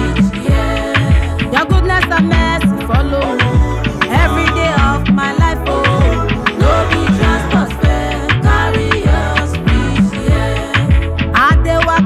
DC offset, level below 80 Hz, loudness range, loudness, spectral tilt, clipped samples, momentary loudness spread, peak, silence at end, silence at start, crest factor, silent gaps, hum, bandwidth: under 0.1%; -18 dBFS; 1 LU; -13 LUFS; -6.5 dB/octave; under 0.1%; 3 LU; 0 dBFS; 0 s; 0 s; 12 dB; none; none; 13 kHz